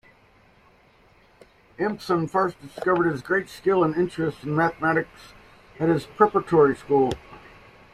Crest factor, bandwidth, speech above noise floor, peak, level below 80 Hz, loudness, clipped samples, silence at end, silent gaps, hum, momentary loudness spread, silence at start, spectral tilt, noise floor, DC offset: 22 dB; 13 kHz; 34 dB; -4 dBFS; -56 dBFS; -23 LUFS; under 0.1%; 0.55 s; none; none; 9 LU; 1.8 s; -7.5 dB/octave; -57 dBFS; under 0.1%